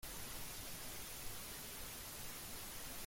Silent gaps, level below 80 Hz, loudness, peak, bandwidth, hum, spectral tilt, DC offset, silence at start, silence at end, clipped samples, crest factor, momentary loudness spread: none; -58 dBFS; -48 LUFS; -34 dBFS; 16.5 kHz; none; -2 dB/octave; under 0.1%; 0 s; 0 s; under 0.1%; 16 dB; 0 LU